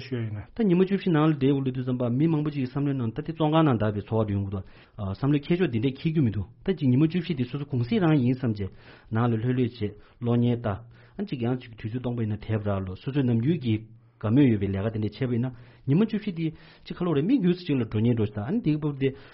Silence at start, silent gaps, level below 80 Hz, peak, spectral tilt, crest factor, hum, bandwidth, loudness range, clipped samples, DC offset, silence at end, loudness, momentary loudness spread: 0 s; none; -54 dBFS; -10 dBFS; -7.5 dB/octave; 16 dB; none; 5.8 kHz; 4 LU; under 0.1%; under 0.1%; 0.05 s; -26 LUFS; 11 LU